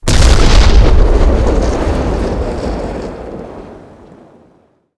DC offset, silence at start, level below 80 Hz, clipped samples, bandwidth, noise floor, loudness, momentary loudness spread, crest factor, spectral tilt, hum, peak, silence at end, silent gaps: under 0.1%; 0 s; -12 dBFS; 2%; 11 kHz; -51 dBFS; -13 LUFS; 18 LU; 10 dB; -5.5 dB/octave; none; 0 dBFS; 1.2 s; none